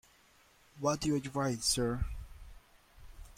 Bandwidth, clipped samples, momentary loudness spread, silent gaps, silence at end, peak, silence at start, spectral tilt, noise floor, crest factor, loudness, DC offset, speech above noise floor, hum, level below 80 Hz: 16.5 kHz; under 0.1%; 13 LU; none; 0.05 s; -18 dBFS; 0.75 s; -4 dB/octave; -65 dBFS; 18 dB; -34 LUFS; under 0.1%; 32 dB; none; -48 dBFS